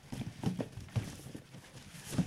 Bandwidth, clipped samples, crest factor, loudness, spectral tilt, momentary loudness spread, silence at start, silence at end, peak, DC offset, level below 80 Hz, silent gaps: 16 kHz; under 0.1%; 20 dB; -42 LUFS; -6 dB/octave; 13 LU; 0 s; 0 s; -20 dBFS; under 0.1%; -58 dBFS; none